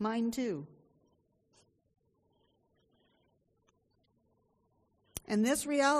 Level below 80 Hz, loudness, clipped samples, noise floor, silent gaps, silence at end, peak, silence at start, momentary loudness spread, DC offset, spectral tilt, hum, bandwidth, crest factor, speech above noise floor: -70 dBFS; -33 LUFS; under 0.1%; -75 dBFS; none; 0 s; -16 dBFS; 0 s; 17 LU; under 0.1%; -4 dB/octave; none; 13 kHz; 22 dB; 44 dB